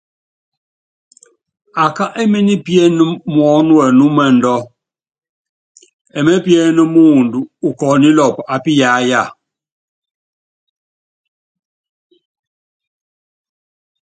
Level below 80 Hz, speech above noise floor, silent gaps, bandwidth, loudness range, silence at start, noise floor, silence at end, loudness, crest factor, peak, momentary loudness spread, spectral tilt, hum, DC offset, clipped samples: -60 dBFS; over 79 dB; 5.18-5.22 s, 5.29-5.75 s, 5.93-6.05 s; 9.2 kHz; 6 LU; 1.75 s; under -90 dBFS; 4.7 s; -12 LUFS; 14 dB; 0 dBFS; 9 LU; -6 dB/octave; none; under 0.1%; under 0.1%